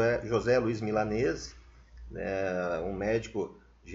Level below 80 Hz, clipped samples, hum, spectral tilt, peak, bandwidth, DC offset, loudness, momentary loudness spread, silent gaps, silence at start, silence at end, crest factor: -50 dBFS; under 0.1%; none; -5.5 dB/octave; -14 dBFS; 7.8 kHz; under 0.1%; -31 LUFS; 12 LU; none; 0 s; 0 s; 16 dB